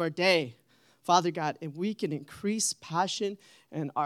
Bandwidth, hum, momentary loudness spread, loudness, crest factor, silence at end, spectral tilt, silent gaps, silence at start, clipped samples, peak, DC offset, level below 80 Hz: 15.5 kHz; none; 14 LU; -29 LUFS; 22 dB; 0 s; -3.5 dB/octave; none; 0 s; under 0.1%; -8 dBFS; under 0.1%; -78 dBFS